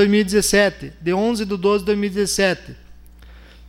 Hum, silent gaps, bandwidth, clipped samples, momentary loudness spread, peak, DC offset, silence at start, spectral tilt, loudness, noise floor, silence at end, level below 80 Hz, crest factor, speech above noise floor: none; none; 16.5 kHz; under 0.1%; 6 LU; -4 dBFS; under 0.1%; 0 s; -4 dB/octave; -19 LUFS; -43 dBFS; 0 s; -42 dBFS; 16 dB; 24 dB